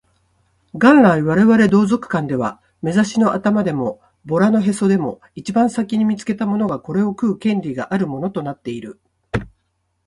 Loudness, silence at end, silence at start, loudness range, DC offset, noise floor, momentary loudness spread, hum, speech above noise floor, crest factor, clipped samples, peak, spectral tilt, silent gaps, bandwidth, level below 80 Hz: -17 LUFS; 0.6 s; 0.75 s; 7 LU; under 0.1%; -69 dBFS; 15 LU; none; 52 dB; 18 dB; under 0.1%; 0 dBFS; -7 dB/octave; none; 11.5 kHz; -50 dBFS